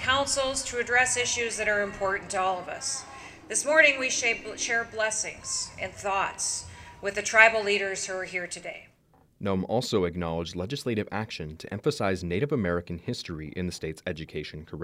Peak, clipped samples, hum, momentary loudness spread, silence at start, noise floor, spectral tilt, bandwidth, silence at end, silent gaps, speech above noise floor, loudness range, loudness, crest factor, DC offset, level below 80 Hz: -4 dBFS; under 0.1%; none; 15 LU; 0 s; -62 dBFS; -3 dB/octave; 15.5 kHz; 0 s; none; 34 dB; 6 LU; -27 LUFS; 24 dB; under 0.1%; -56 dBFS